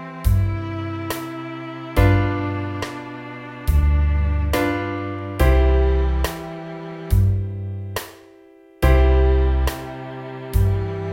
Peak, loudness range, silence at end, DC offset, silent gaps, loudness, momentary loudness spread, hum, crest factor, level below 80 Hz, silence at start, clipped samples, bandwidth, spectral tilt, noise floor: -4 dBFS; 3 LU; 0 s; under 0.1%; none; -21 LUFS; 15 LU; none; 16 dB; -22 dBFS; 0 s; under 0.1%; 17 kHz; -7 dB/octave; -48 dBFS